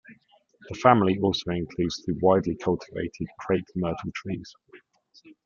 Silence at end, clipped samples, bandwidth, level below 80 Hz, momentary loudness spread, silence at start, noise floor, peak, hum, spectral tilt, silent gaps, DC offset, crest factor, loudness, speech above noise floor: 0.15 s; under 0.1%; 7.4 kHz; -56 dBFS; 15 LU; 0.1 s; -60 dBFS; -2 dBFS; none; -6.5 dB/octave; none; under 0.1%; 24 dB; -26 LUFS; 35 dB